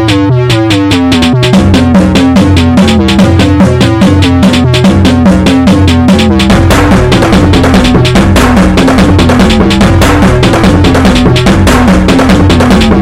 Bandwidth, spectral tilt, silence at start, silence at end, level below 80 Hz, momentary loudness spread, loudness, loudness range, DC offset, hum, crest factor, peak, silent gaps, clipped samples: 15.5 kHz; -6 dB/octave; 0 s; 0 s; -16 dBFS; 1 LU; -5 LUFS; 0 LU; under 0.1%; none; 4 dB; 0 dBFS; none; 4%